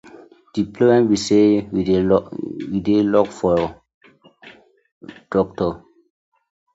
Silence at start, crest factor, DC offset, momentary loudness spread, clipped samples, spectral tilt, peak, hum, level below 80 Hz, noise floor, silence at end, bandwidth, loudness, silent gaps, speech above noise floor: 0.55 s; 18 dB; under 0.1%; 12 LU; under 0.1%; -6.5 dB/octave; -2 dBFS; none; -48 dBFS; -47 dBFS; 0.95 s; 8 kHz; -19 LUFS; 3.94-4.01 s, 4.92-5.01 s; 29 dB